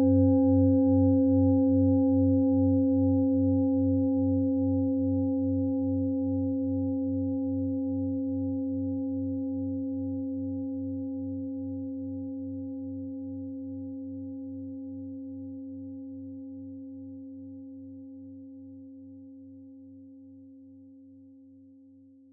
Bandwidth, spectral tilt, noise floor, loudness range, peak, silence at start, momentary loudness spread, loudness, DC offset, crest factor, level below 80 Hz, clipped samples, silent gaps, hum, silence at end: 0.9 kHz; -16 dB/octave; -55 dBFS; 22 LU; -14 dBFS; 0 s; 22 LU; -28 LUFS; under 0.1%; 16 dB; -72 dBFS; under 0.1%; none; none; 1.05 s